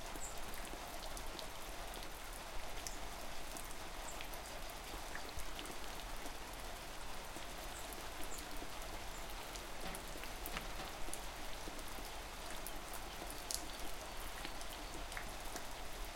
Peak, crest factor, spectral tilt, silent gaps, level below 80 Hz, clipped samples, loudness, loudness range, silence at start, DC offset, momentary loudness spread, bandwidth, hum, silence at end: -18 dBFS; 28 dB; -2.5 dB/octave; none; -52 dBFS; under 0.1%; -47 LUFS; 1 LU; 0 s; under 0.1%; 2 LU; 17 kHz; none; 0 s